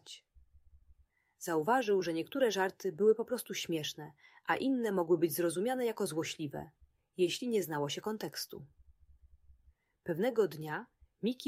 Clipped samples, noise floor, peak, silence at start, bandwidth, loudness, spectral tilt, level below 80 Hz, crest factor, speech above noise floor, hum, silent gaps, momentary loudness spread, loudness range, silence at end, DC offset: under 0.1%; -69 dBFS; -16 dBFS; 0.05 s; 16 kHz; -34 LUFS; -4.5 dB/octave; -70 dBFS; 18 dB; 35 dB; none; none; 15 LU; 5 LU; 0 s; under 0.1%